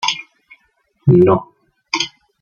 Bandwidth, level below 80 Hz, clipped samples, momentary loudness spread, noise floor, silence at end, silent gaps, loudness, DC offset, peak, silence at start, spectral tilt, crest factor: 7.2 kHz; -50 dBFS; under 0.1%; 12 LU; -62 dBFS; 0.35 s; none; -16 LUFS; under 0.1%; 0 dBFS; 0 s; -5.5 dB/octave; 18 dB